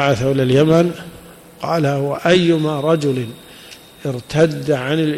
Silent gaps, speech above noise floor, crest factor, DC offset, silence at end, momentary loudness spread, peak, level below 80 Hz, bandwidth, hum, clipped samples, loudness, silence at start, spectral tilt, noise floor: none; 24 dB; 14 dB; under 0.1%; 0 s; 18 LU; -4 dBFS; -50 dBFS; 15 kHz; none; under 0.1%; -17 LUFS; 0 s; -6.5 dB/octave; -40 dBFS